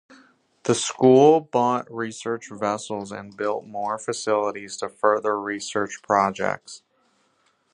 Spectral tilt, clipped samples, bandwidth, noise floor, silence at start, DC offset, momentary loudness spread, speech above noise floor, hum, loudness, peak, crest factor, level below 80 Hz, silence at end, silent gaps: -4.5 dB/octave; under 0.1%; 10.5 kHz; -66 dBFS; 0.65 s; under 0.1%; 15 LU; 44 dB; none; -23 LUFS; -4 dBFS; 20 dB; -66 dBFS; 0.95 s; none